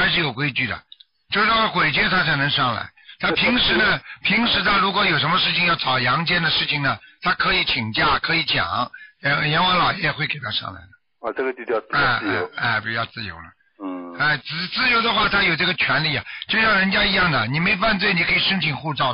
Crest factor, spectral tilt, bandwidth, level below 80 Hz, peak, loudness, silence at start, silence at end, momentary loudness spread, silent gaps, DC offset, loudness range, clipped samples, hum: 12 dB; -9 dB/octave; 5.6 kHz; -46 dBFS; -8 dBFS; -19 LUFS; 0 s; 0 s; 9 LU; none; 0.1%; 5 LU; under 0.1%; none